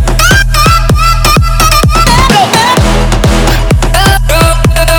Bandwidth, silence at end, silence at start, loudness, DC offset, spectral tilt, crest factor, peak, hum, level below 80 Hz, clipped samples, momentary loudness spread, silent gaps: over 20 kHz; 0 s; 0 s; -7 LUFS; under 0.1%; -4 dB/octave; 6 dB; 0 dBFS; none; -10 dBFS; 1%; 3 LU; none